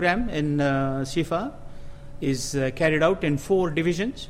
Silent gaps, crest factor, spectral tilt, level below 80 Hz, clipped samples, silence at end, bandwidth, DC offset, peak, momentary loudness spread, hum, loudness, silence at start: none; 16 dB; -5.5 dB/octave; -42 dBFS; under 0.1%; 0 s; 15.5 kHz; under 0.1%; -8 dBFS; 7 LU; none; -24 LUFS; 0 s